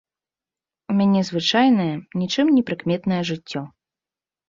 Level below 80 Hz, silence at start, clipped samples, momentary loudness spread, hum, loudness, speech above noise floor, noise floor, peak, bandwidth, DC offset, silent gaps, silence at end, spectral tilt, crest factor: -62 dBFS; 0.9 s; under 0.1%; 12 LU; none; -20 LUFS; over 70 dB; under -90 dBFS; -6 dBFS; 7.6 kHz; under 0.1%; none; 0.8 s; -6 dB/octave; 16 dB